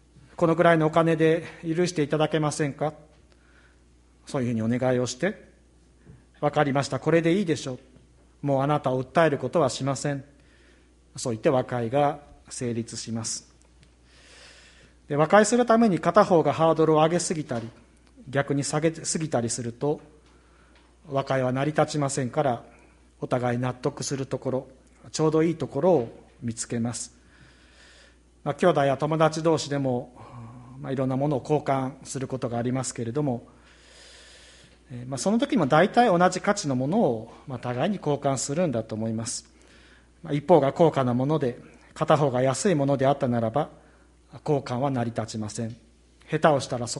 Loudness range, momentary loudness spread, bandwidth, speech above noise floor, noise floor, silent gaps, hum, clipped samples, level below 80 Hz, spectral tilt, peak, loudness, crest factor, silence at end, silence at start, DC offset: 6 LU; 14 LU; 11.5 kHz; 33 dB; -57 dBFS; none; none; under 0.1%; -58 dBFS; -5.5 dB/octave; -2 dBFS; -25 LUFS; 22 dB; 0 s; 0.4 s; under 0.1%